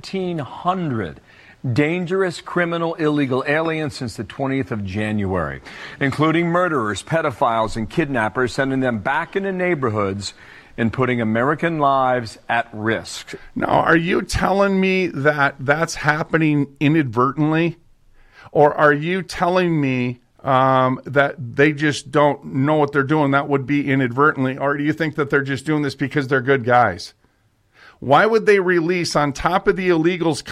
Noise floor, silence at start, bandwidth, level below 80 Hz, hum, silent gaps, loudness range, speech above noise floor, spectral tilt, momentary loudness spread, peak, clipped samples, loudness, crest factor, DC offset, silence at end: -61 dBFS; 0.05 s; 13.5 kHz; -46 dBFS; none; none; 4 LU; 42 dB; -6 dB/octave; 8 LU; -2 dBFS; under 0.1%; -19 LUFS; 16 dB; under 0.1%; 0 s